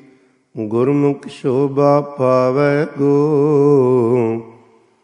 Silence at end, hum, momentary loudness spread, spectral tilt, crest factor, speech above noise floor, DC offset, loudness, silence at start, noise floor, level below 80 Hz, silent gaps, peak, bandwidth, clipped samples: 0.55 s; none; 9 LU; -9 dB/octave; 14 dB; 37 dB; under 0.1%; -15 LUFS; 0.55 s; -51 dBFS; -66 dBFS; none; 0 dBFS; 9.8 kHz; under 0.1%